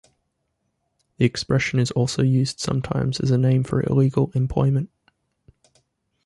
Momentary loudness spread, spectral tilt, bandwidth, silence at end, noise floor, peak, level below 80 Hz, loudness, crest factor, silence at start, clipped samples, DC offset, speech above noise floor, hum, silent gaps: 5 LU; -6.5 dB/octave; 11.5 kHz; 1.4 s; -74 dBFS; -6 dBFS; -46 dBFS; -21 LUFS; 18 dB; 1.2 s; under 0.1%; under 0.1%; 54 dB; none; none